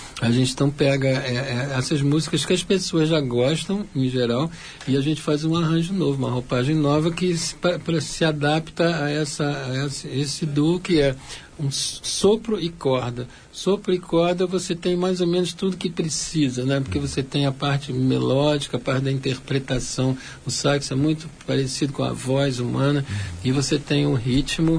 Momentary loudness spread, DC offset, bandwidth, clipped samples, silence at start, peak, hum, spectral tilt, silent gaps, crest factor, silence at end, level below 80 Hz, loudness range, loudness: 6 LU; under 0.1%; 10.5 kHz; under 0.1%; 0 s; -6 dBFS; none; -5.5 dB/octave; none; 16 dB; 0 s; -44 dBFS; 2 LU; -22 LUFS